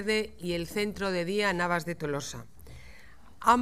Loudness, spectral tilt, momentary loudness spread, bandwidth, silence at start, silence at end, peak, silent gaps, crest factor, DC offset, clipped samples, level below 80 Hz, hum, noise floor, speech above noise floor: -30 LUFS; -4.5 dB/octave; 23 LU; 15.5 kHz; 0 s; 0 s; -8 dBFS; none; 22 dB; 0.4%; under 0.1%; -54 dBFS; none; -55 dBFS; 24 dB